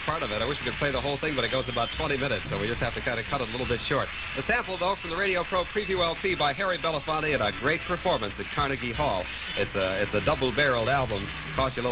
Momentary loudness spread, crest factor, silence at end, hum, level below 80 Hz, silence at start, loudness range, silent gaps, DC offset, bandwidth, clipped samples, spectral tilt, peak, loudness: 4 LU; 16 dB; 0 s; none; -44 dBFS; 0 s; 2 LU; none; under 0.1%; 4 kHz; under 0.1%; -2.5 dB/octave; -12 dBFS; -27 LUFS